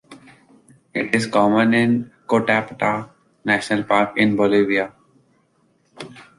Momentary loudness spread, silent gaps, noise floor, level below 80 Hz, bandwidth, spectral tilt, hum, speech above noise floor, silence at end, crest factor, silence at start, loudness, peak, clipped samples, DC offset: 13 LU; none; -62 dBFS; -60 dBFS; 11.5 kHz; -6 dB/octave; none; 44 dB; 0.15 s; 18 dB; 0.1 s; -19 LUFS; -2 dBFS; under 0.1%; under 0.1%